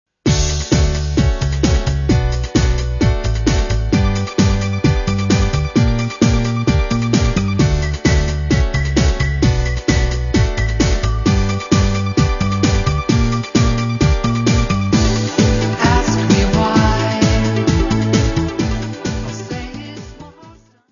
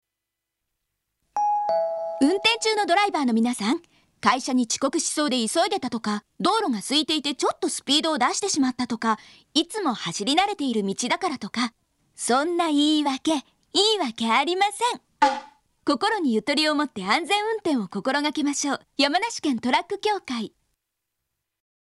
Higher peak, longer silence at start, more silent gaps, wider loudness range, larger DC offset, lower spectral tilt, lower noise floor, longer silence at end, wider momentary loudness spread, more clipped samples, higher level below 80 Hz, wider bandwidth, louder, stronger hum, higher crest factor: first, 0 dBFS vs -4 dBFS; second, 0.25 s vs 1.35 s; neither; about the same, 2 LU vs 3 LU; neither; first, -5.5 dB/octave vs -2.5 dB/octave; second, -44 dBFS vs -84 dBFS; second, 0.4 s vs 1.45 s; second, 3 LU vs 7 LU; neither; first, -20 dBFS vs -68 dBFS; second, 7.4 kHz vs 12 kHz; first, -16 LUFS vs -23 LUFS; neither; second, 14 dB vs 20 dB